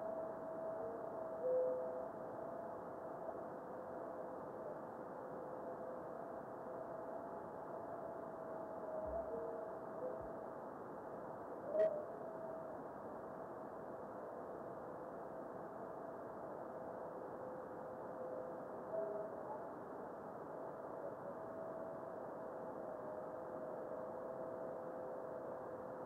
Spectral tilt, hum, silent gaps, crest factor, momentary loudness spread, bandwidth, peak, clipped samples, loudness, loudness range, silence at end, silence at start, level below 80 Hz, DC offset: -8.5 dB/octave; none; none; 20 dB; 6 LU; 16 kHz; -26 dBFS; under 0.1%; -48 LUFS; 5 LU; 0 s; 0 s; -76 dBFS; under 0.1%